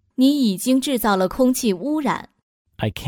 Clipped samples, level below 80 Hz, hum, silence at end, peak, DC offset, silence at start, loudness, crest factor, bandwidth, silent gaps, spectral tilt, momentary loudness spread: under 0.1%; -48 dBFS; none; 0 s; -6 dBFS; under 0.1%; 0.2 s; -20 LUFS; 14 dB; 19 kHz; 2.43-2.65 s; -5 dB/octave; 9 LU